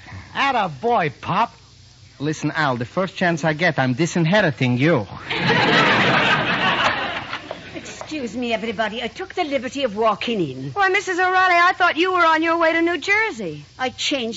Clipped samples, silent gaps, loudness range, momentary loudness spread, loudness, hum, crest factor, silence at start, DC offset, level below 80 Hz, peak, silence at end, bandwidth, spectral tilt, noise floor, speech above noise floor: under 0.1%; none; 6 LU; 13 LU; -19 LUFS; none; 16 dB; 0.05 s; under 0.1%; -54 dBFS; -4 dBFS; 0 s; 8 kHz; -3 dB/octave; -47 dBFS; 27 dB